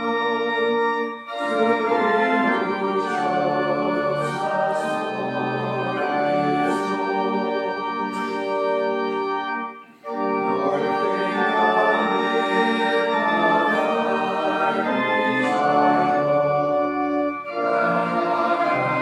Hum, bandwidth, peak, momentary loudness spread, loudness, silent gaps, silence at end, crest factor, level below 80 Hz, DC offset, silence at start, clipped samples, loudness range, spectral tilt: none; 12 kHz; -6 dBFS; 7 LU; -21 LUFS; none; 0 s; 16 dB; -66 dBFS; under 0.1%; 0 s; under 0.1%; 4 LU; -6 dB/octave